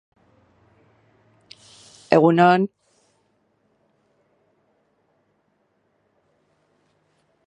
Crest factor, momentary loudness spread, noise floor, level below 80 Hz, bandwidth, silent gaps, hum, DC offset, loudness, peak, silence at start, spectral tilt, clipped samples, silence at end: 26 dB; 30 LU; -68 dBFS; -70 dBFS; 10 kHz; none; none; under 0.1%; -17 LUFS; 0 dBFS; 2.1 s; -7.5 dB/octave; under 0.1%; 4.8 s